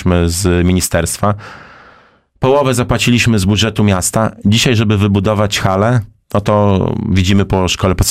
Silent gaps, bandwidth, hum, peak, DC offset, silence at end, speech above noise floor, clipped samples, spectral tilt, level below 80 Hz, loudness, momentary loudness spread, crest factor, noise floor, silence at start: none; 16 kHz; none; -2 dBFS; under 0.1%; 0 s; 36 dB; under 0.1%; -5 dB/octave; -30 dBFS; -13 LUFS; 5 LU; 12 dB; -48 dBFS; 0 s